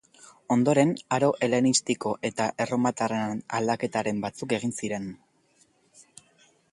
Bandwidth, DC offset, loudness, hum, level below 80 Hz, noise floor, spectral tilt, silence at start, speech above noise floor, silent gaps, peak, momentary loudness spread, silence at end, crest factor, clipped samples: 11.5 kHz; under 0.1%; -26 LUFS; none; -66 dBFS; -65 dBFS; -4.5 dB/octave; 0.5 s; 39 dB; none; -8 dBFS; 8 LU; 1.55 s; 20 dB; under 0.1%